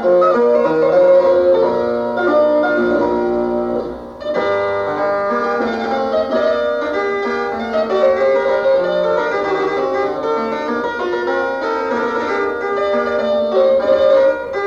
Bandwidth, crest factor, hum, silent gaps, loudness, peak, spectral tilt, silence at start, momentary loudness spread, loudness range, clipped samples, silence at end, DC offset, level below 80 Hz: 7.2 kHz; 12 dB; none; none; -16 LUFS; -2 dBFS; -6 dB/octave; 0 s; 7 LU; 4 LU; under 0.1%; 0 s; under 0.1%; -48 dBFS